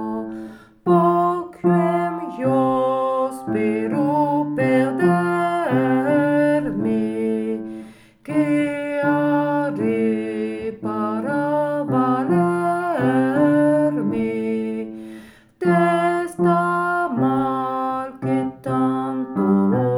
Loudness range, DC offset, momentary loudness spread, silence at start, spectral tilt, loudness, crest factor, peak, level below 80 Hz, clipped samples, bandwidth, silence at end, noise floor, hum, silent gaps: 2 LU; under 0.1%; 8 LU; 0 s; -8 dB/octave; -20 LUFS; 14 dB; -4 dBFS; -58 dBFS; under 0.1%; 17 kHz; 0 s; -42 dBFS; none; none